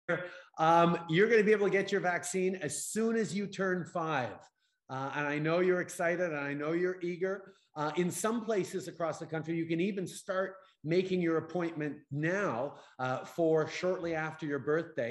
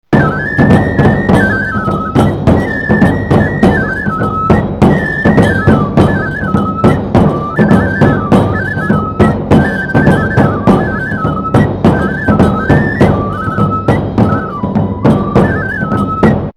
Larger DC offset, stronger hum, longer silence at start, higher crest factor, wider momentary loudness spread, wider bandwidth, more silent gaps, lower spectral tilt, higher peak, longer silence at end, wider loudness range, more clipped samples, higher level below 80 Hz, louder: second, under 0.1% vs 0.2%; neither; about the same, 0.1 s vs 0.1 s; first, 18 dB vs 10 dB; first, 11 LU vs 5 LU; about the same, 13 kHz vs 12 kHz; neither; second, -5.5 dB/octave vs -8.5 dB/octave; second, -14 dBFS vs 0 dBFS; about the same, 0 s vs 0.05 s; first, 5 LU vs 1 LU; second, under 0.1% vs 0.7%; second, -78 dBFS vs -26 dBFS; second, -32 LUFS vs -11 LUFS